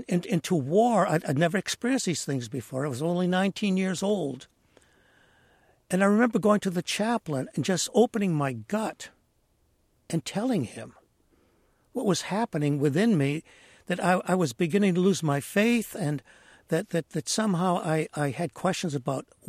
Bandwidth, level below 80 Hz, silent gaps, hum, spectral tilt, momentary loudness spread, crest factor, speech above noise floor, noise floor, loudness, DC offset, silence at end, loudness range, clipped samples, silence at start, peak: 15.5 kHz; -68 dBFS; none; none; -5.5 dB/octave; 9 LU; 18 dB; 42 dB; -68 dBFS; -27 LUFS; under 0.1%; 0.25 s; 5 LU; under 0.1%; 0 s; -10 dBFS